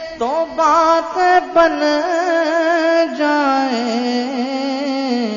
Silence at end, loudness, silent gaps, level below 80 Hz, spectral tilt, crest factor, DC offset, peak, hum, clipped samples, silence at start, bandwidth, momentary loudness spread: 0 s; -16 LUFS; none; -54 dBFS; -3.5 dB/octave; 14 dB; under 0.1%; 0 dBFS; none; under 0.1%; 0 s; 7.4 kHz; 7 LU